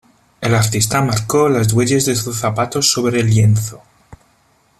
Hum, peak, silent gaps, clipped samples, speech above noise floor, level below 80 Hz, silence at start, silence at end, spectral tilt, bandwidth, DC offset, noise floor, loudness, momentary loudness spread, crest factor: none; 0 dBFS; none; under 0.1%; 41 dB; -46 dBFS; 0.4 s; 0.65 s; -4.5 dB/octave; 14.5 kHz; under 0.1%; -56 dBFS; -15 LUFS; 5 LU; 16 dB